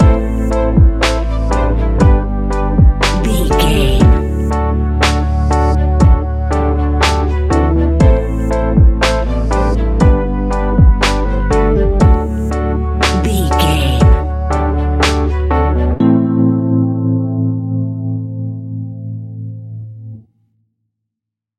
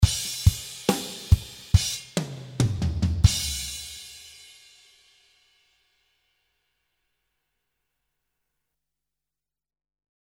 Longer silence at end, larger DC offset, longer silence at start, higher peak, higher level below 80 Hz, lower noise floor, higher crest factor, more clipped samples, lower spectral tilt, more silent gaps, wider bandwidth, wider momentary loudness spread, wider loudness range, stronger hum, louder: second, 1.4 s vs 6 s; neither; about the same, 0 s vs 0 s; first, 0 dBFS vs -4 dBFS; first, -14 dBFS vs -34 dBFS; second, -81 dBFS vs under -90 dBFS; second, 12 dB vs 24 dB; neither; first, -6.5 dB/octave vs -4.5 dB/octave; neither; second, 13.5 kHz vs 17 kHz; second, 10 LU vs 17 LU; second, 6 LU vs 14 LU; neither; first, -14 LUFS vs -25 LUFS